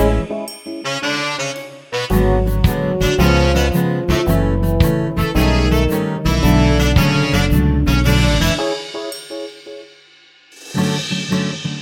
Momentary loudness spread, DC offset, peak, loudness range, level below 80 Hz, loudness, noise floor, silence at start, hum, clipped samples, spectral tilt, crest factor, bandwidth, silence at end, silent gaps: 13 LU; under 0.1%; 0 dBFS; 5 LU; -22 dBFS; -17 LUFS; -48 dBFS; 0 s; none; under 0.1%; -5.5 dB/octave; 16 dB; 18 kHz; 0 s; none